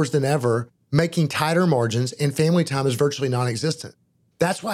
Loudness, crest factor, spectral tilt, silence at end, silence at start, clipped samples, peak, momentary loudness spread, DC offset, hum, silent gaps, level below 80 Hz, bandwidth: -22 LUFS; 20 dB; -6 dB/octave; 0 s; 0 s; under 0.1%; -2 dBFS; 6 LU; under 0.1%; none; none; -60 dBFS; 16 kHz